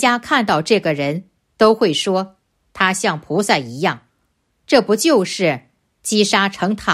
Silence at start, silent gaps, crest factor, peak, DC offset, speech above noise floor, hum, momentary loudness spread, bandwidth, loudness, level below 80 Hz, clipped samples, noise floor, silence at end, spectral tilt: 0 s; none; 16 dB; 0 dBFS; under 0.1%; 50 dB; none; 8 LU; 14.5 kHz; -17 LUFS; -56 dBFS; under 0.1%; -66 dBFS; 0 s; -4 dB/octave